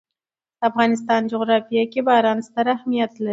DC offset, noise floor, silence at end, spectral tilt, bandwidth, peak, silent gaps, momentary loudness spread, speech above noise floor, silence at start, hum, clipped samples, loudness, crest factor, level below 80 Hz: under 0.1%; under -90 dBFS; 0 s; -5.5 dB/octave; 8 kHz; -2 dBFS; none; 5 LU; over 71 dB; 0.6 s; none; under 0.1%; -20 LUFS; 18 dB; -72 dBFS